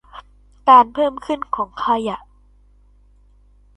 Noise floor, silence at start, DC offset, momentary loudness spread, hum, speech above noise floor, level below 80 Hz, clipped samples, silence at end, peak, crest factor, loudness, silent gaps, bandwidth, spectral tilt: -51 dBFS; 0.15 s; under 0.1%; 15 LU; 50 Hz at -50 dBFS; 35 dB; -50 dBFS; under 0.1%; 1.6 s; 0 dBFS; 20 dB; -17 LUFS; none; 9 kHz; -5.5 dB/octave